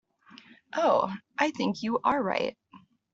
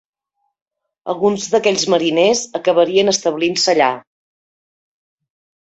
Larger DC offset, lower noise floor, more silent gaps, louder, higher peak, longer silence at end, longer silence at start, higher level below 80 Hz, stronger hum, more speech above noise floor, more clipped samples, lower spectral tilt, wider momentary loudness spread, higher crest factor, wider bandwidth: neither; second, -57 dBFS vs -72 dBFS; neither; second, -28 LUFS vs -15 LUFS; second, -10 dBFS vs -2 dBFS; second, 0.35 s vs 1.8 s; second, 0.75 s vs 1.05 s; second, -70 dBFS vs -62 dBFS; neither; second, 30 dB vs 56 dB; neither; first, -5 dB/octave vs -3 dB/octave; first, 8 LU vs 5 LU; about the same, 20 dB vs 16 dB; about the same, 8 kHz vs 8.2 kHz